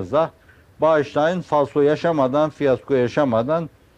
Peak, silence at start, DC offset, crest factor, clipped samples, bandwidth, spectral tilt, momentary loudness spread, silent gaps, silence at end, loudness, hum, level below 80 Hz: -6 dBFS; 0 s; under 0.1%; 14 dB; under 0.1%; 8.8 kHz; -7.5 dB/octave; 4 LU; none; 0.3 s; -20 LUFS; none; -56 dBFS